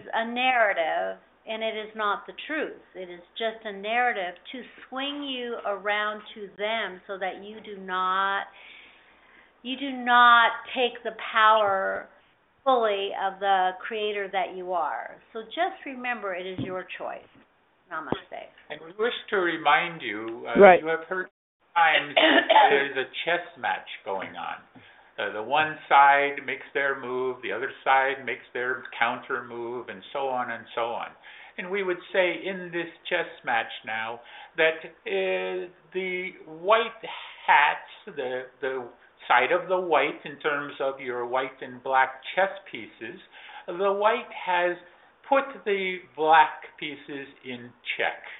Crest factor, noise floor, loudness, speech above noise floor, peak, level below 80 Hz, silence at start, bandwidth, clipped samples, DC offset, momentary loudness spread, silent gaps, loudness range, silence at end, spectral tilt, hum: 26 dB; -62 dBFS; -25 LUFS; 36 dB; 0 dBFS; -70 dBFS; 0 s; 4.1 kHz; under 0.1%; under 0.1%; 19 LU; 21.31-21.60 s; 9 LU; 0 s; -0.5 dB/octave; none